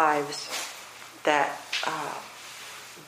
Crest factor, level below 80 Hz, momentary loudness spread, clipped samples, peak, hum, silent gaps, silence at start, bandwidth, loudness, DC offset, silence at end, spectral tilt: 24 dB; -78 dBFS; 16 LU; under 0.1%; -6 dBFS; none; none; 0 s; 15.5 kHz; -29 LUFS; under 0.1%; 0 s; -2 dB/octave